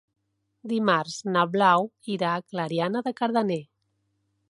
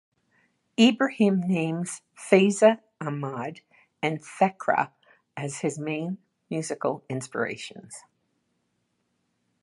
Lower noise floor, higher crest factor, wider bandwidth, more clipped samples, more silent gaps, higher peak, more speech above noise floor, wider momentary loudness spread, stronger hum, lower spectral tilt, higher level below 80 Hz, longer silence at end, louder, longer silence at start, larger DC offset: about the same, -74 dBFS vs -75 dBFS; about the same, 20 dB vs 24 dB; about the same, 11.5 kHz vs 11.5 kHz; neither; neither; about the same, -6 dBFS vs -4 dBFS; about the same, 49 dB vs 50 dB; second, 10 LU vs 17 LU; neither; about the same, -5.5 dB/octave vs -5.5 dB/octave; about the same, -76 dBFS vs -76 dBFS; second, 0.85 s vs 1.6 s; about the same, -25 LUFS vs -26 LUFS; second, 0.65 s vs 0.8 s; neither